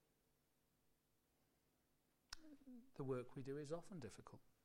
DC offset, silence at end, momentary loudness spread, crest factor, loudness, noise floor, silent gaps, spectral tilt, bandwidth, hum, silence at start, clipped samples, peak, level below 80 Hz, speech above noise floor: under 0.1%; 0.15 s; 14 LU; 20 dB; -53 LUFS; -84 dBFS; none; -6 dB/octave; 16 kHz; none; 2.3 s; under 0.1%; -36 dBFS; -76 dBFS; 32 dB